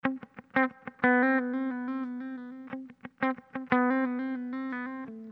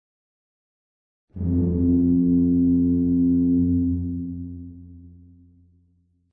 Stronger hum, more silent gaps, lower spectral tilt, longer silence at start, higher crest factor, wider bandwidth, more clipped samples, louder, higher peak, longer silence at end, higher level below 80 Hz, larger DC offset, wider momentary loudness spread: first, 60 Hz at -70 dBFS vs none; neither; second, -8.5 dB/octave vs -16 dB/octave; second, 0.05 s vs 1.35 s; first, 22 dB vs 12 dB; first, 4.6 kHz vs 1.1 kHz; neither; second, -30 LUFS vs -21 LUFS; about the same, -8 dBFS vs -10 dBFS; second, 0 s vs 1.25 s; second, -76 dBFS vs -42 dBFS; neither; about the same, 16 LU vs 15 LU